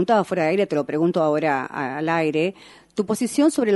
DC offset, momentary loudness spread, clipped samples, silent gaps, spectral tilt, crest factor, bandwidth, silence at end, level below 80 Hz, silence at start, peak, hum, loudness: under 0.1%; 7 LU; under 0.1%; none; -5.5 dB/octave; 16 dB; 11.5 kHz; 0 s; -66 dBFS; 0 s; -6 dBFS; none; -22 LUFS